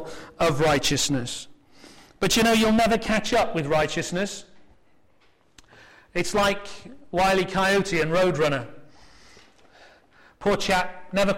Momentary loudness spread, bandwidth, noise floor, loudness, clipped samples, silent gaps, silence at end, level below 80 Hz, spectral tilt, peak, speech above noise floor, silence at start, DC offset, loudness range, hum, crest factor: 13 LU; 16.5 kHz; -63 dBFS; -23 LUFS; under 0.1%; none; 0 s; -44 dBFS; -4 dB/octave; -10 dBFS; 40 dB; 0 s; under 0.1%; 5 LU; none; 14 dB